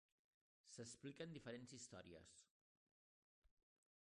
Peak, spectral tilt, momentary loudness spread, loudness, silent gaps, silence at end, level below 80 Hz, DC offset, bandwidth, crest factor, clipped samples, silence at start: -40 dBFS; -4 dB/octave; 9 LU; -58 LUFS; 2.50-3.42 s; 0.6 s; -86 dBFS; under 0.1%; 11 kHz; 22 dB; under 0.1%; 0.65 s